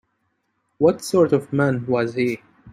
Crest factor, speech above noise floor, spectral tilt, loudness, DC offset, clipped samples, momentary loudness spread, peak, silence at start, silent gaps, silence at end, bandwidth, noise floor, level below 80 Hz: 18 dB; 52 dB; -6.5 dB/octave; -20 LUFS; under 0.1%; under 0.1%; 6 LU; -4 dBFS; 0.8 s; none; 0 s; 15.5 kHz; -71 dBFS; -62 dBFS